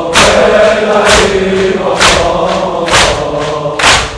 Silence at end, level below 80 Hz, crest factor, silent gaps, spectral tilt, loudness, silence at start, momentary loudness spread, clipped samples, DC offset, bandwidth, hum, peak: 0 s; -26 dBFS; 8 dB; none; -3 dB/octave; -8 LUFS; 0 s; 7 LU; 2%; under 0.1%; 11 kHz; none; 0 dBFS